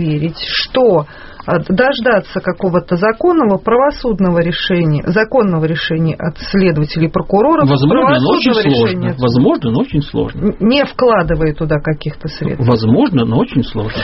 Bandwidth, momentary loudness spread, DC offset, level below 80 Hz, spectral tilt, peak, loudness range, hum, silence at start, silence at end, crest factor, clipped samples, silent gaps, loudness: 6 kHz; 7 LU; under 0.1%; -34 dBFS; -5.5 dB/octave; 0 dBFS; 2 LU; none; 0 s; 0 s; 12 dB; under 0.1%; none; -13 LUFS